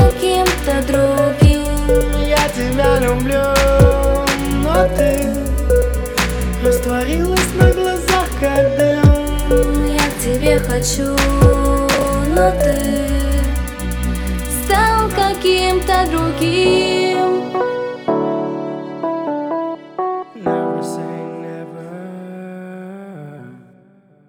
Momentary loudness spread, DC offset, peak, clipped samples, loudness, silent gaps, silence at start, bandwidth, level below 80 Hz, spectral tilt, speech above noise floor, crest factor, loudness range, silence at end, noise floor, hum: 13 LU; under 0.1%; 0 dBFS; under 0.1%; -16 LUFS; none; 0 s; over 20 kHz; -22 dBFS; -5.5 dB/octave; 35 dB; 16 dB; 8 LU; 0.7 s; -49 dBFS; none